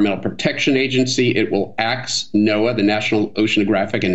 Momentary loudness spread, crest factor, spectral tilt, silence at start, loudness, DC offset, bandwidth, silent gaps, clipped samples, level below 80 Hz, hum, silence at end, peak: 4 LU; 16 dB; -4.5 dB/octave; 0 s; -18 LUFS; 1%; 8.2 kHz; none; under 0.1%; -56 dBFS; none; 0 s; -2 dBFS